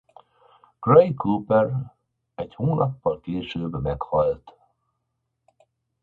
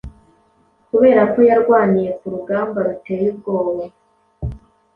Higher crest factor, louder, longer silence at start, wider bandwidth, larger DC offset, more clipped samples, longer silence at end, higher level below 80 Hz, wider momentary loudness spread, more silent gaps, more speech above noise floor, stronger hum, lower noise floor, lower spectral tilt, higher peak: first, 22 dB vs 16 dB; second, -23 LUFS vs -16 LUFS; first, 0.8 s vs 0.05 s; about the same, 4.4 kHz vs 4.2 kHz; neither; neither; first, 1.5 s vs 0.4 s; second, -48 dBFS vs -42 dBFS; about the same, 19 LU vs 18 LU; neither; first, 56 dB vs 42 dB; neither; first, -78 dBFS vs -57 dBFS; about the same, -10 dB/octave vs -10 dB/octave; about the same, -2 dBFS vs -2 dBFS